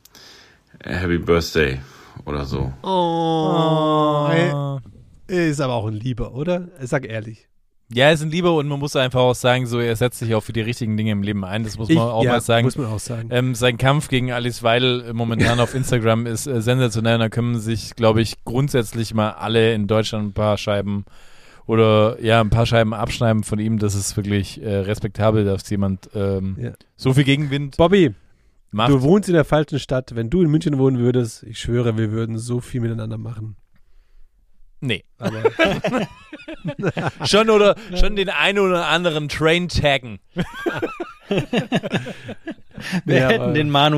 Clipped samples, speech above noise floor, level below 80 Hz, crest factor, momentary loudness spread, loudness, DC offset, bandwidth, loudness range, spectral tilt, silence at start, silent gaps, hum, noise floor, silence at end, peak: under 0.1%; 34 dB; -38 dBFS; 18 dB; 11 LU; -19 LUFS; under 0.1%; 14.5 kHz; 5 LU; -6 dB/octave; 0.3 s; none; none; -53 dBFS; 0 s; -2 dBFS